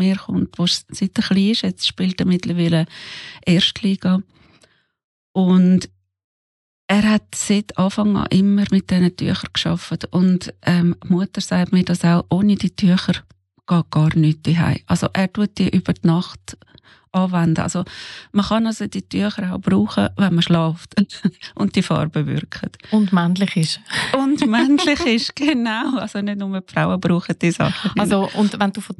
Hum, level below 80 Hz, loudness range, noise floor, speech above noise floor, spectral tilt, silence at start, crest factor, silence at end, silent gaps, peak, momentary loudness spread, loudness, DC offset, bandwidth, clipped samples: none; -48 dBFS; 3 LU; -57 dBFS; 39 dB; -6 dB/octave; 0 s; 16 dB; 0.05 s; 5.04-5.34 s, 6.24-6.88 s; -4 dBFS; 8 LU; -18 LUFS; under 0.1%; 12 kHz; under 0.1%